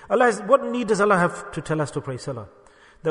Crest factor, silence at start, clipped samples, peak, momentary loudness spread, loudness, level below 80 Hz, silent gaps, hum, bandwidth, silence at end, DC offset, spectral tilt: 20 dB; 0 s; under 0.1%; -2 dBFS; 14 LU; -22 LUFS; -56 dBFS; none; none; 10.5 kHz; 0 s; under 0.1%; -5.5 dB/octave